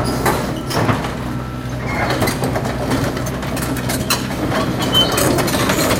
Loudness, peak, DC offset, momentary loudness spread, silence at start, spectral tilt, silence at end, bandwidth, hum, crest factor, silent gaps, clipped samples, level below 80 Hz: -18 LUFS; -2 dBFS; under 0.1%; 8 LU; 0 s; -4 dB/octave; 0 s; 17 kHz; none; 16 dB; none; under 0.1%; -32 dBFS